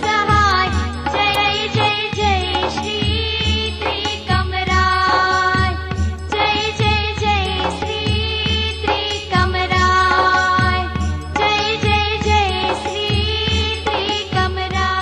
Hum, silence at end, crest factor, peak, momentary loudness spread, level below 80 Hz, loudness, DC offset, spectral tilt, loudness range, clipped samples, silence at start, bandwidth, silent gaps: none; 0 s; 14 dB; -2 dBFS; 6 LU; -28 dBFS; -17 LUFS; under 0.1%; -4.5 dB/octave; 2 LU; under 0.1%; 0 s; 12 kHz; none